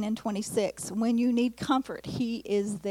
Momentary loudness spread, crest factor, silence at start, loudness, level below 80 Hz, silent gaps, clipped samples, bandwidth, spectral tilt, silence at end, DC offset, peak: 6 LU; 16 dB; 0 s; -29 LUFS; -62 dBFS; none; under 0.1%; 15.5 kHz; -5 dB/octave; 0 s; under 0.1%; -14 dBFS